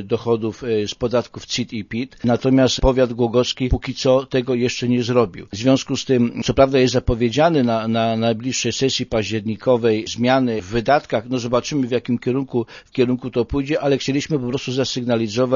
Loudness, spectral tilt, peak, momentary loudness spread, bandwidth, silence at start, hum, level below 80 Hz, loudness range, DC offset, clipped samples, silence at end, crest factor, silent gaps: -19 LUFS; -5.5 dB/octave; 0 dBFS; 7 LU; 7.4 kHz; 0 s; none; -36 dBFS; 3 LU; under 0.1%; under 0.1%; 0 s; 18 dB; none